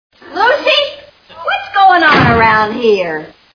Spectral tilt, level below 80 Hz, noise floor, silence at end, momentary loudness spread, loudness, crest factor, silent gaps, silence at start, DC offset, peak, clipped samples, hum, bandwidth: -5.5 dB/octave; -40 dBFS; -35 dBFS; 0.3 s; 13 LU; -10 LUFS; 12 dB; none; 0.25 s; under 0.1%; 0 dBFS; under 0.1%; none; 5.4 kHz